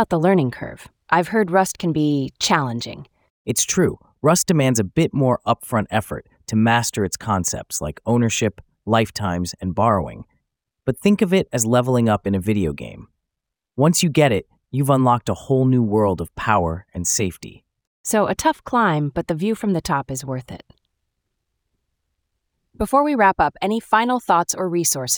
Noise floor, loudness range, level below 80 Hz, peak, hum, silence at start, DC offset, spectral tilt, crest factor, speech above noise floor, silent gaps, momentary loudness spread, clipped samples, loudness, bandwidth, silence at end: -83 dBFS; 4 LU; -48 dBFS; -2 dBFS; none; 0 s; under 0.1%; -5 dB/octave; 18 dB; 64 dB; 3.30-3.45 s, 17.87-18.04 s; 11 LU; under 0.1%; -20 LUFS; over 20 kHz; 0 s